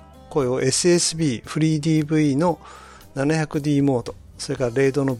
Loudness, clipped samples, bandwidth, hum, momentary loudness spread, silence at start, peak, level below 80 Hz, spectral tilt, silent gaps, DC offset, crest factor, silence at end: -21 LUFS; under 0.1%; 14 kHz; none; 11 LU; 0.2 s; -8 dBFS; -50 dBFS; -5 dB/octave; none; under 0.1%; 14 dB; 0 s